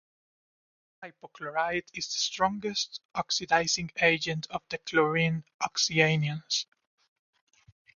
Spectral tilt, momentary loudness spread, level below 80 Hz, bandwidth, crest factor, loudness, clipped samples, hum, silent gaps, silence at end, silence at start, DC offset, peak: -3.5 dB/octave; 12 LU; -64 dBFS; 7.4 kHz; 24 dB; -28 LUFS; under 0.1%; none; 3.05-3.09 s, 5.54-5.59 s; 1.35 s; 1 s; under 0.1%; -6 dBFS